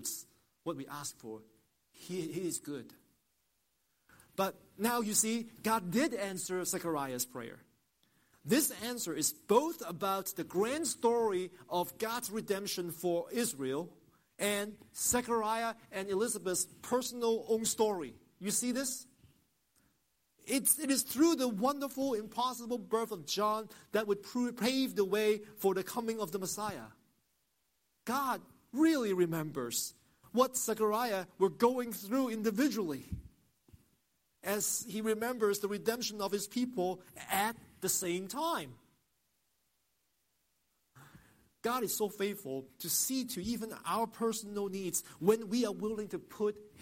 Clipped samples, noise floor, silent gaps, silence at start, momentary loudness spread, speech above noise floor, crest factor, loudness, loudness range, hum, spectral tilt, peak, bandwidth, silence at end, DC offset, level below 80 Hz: under 0.1%; -79 dBFS; none; 0 s; 11 LU; 45 dB; 24 dB; -34 LUFS; 6 LU; none; -3.5 dB/octave; -12 dBFS; 16.5 kHz; 0 s; under 0.1%; -68 dBFS